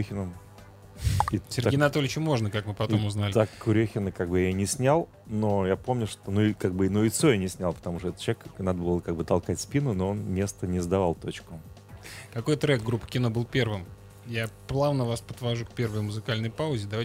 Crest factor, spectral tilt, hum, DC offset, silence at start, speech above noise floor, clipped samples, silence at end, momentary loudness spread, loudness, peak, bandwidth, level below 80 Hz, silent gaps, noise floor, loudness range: 20 dB; -6 dB/octave; none; under 0.1%; 0 s; 22 dB; under 0.1%; 0 s; 10 LU; -28 LUFS; -8 dBFS; 16 kHz; -48 dBFS; none; -49 dBFS; 4 LU